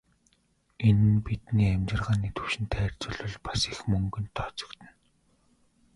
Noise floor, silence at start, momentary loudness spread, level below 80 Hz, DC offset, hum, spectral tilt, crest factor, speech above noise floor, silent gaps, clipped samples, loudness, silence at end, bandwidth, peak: -69 dBFS; 0.8 s; 12 LU; -44 dBFS; under 0.1%; none; -6 dB/octave; 18 dB; 42 dB; none; under 0.1%; -28 LUFS; 1.1 s; 11.5 kHz; -10 dBFS